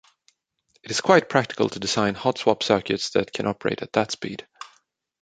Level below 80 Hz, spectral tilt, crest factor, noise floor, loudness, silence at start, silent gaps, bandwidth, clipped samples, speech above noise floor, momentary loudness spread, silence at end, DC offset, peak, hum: -60 dBFS; -4 dB/octave; 22 dB; -68 dBFS; -23 LUFS; 0.85 s; none; 9.4 kHz; under 0.1%; 45 dB; 16 LU; 0.55 s; under 0.1%; -2 dBFS; none